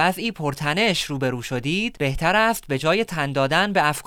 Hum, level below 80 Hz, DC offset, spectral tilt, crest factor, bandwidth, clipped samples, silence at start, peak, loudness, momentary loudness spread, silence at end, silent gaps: none; -44 dBFS; under 0.1%; -4.5 dB/octave; 18 dB; 18 kHz; under 0.1%; 0 s; -4 dBFS; -21 LUFS; 7 LU; 0.05 s; none